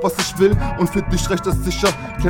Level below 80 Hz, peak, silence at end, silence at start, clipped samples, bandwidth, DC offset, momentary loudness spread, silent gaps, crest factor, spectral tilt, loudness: -26 dBFS; -2 dBFS; 0 s; 0 s; under 0.1%; 19 kHz; under 0.1%; 4 LU; none; 16 dB; -5 dB/octave; -19 LUFS